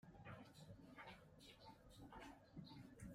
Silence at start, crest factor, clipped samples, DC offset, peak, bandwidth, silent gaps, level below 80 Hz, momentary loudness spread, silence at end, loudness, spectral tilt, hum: 0 s; 16 dB; under 0.1%; under 0.1%; -46 dBFS; 15.5 kHz; none; -74 dBFS; 4 LU; 0 s; -62 LUFS; -5.5 dB/octave; none